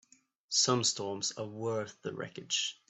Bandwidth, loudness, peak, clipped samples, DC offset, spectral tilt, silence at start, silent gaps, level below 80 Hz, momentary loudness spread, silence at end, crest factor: 8.6 kHz; -32 LUFS; -14 dBFS; under 0.1%; under 0.1%; -2.5 dB/octave; 0.5 s; none; -78 dBFS; 13 LU; 0.15 s; 20 dB